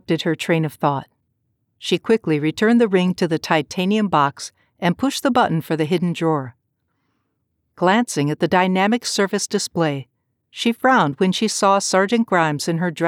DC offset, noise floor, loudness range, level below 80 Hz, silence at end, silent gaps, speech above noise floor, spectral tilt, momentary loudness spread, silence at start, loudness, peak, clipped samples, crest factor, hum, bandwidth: under 0.1%; -72 dBFS; 3 LU; -62 dBFS; 0 s; none; 53 dB; -5 dB/octave; 7 LU; 0.1 s; -19 LUFS; -4 dBFS; under 0.1%; 16 dB; none; 17 kHz